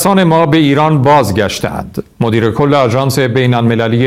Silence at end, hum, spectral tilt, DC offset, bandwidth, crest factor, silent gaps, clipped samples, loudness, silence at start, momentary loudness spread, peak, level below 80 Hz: 0 s; none; -6 dB/octave; 0.2%; 16.5 kHz; 10 dB; none; under 0.1%; -11 LUFS; 0 s; 9 LU; 0 dBFS; -40 dBFS